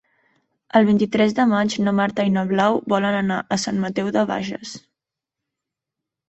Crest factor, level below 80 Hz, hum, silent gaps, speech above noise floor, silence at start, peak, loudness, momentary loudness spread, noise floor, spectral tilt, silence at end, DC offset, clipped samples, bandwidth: 18 dB; -60 dBFS; none; none; 66 dB; 0.75 s; -2 dBFS; -20 LUFS; 8 LU; -85 dBFS; -5.5 dB/octave; 1.5 s; under 0.1%; under 0.1%; 8.2 kHz